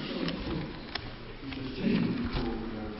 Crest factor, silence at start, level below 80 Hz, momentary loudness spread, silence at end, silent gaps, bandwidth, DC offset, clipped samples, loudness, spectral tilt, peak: 16 dB; 0 s; -44 dBFS; 11 LU; 0 s; none; 5.8 kHz; under 0.1%; under 0.1%; -34 LUFS; -10 dB/octave; -18 dBFS